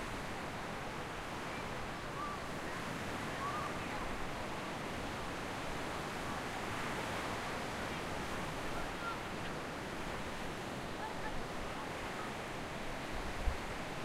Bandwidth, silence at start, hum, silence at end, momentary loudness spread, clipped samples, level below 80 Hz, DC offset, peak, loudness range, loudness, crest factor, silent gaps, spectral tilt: 16 kHz; 0 s; none; 0 s; 3 LU; under 0.1%; -50 dBFS; under 0.1%; -20 dBFS; 2 LU; -41 LUFS; 20 dB; none; -4.5 dB/octave